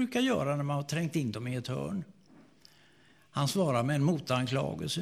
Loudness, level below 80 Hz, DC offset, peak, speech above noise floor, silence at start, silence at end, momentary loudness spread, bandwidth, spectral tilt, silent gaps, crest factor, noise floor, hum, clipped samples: -31 LUFS; -64 dBFS; under 0.1%; -14 dBFS; 32 dB; 0 s; 0 s; 8 LU; 15.5 kHz; -6 dB/octave; none; 18 dB; -63 dBFS; none; under 0.1%